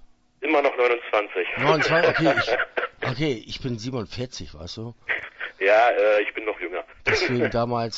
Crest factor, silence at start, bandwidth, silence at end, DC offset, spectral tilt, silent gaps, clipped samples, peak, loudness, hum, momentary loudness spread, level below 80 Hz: 18 dB; 0.4 s; 8 kHz; 0 s; under 0.1%; -5 dB/octave; none; under 0.1%; -4 dBFS; -23 LUFS; none; 14 LU; -50 dBFS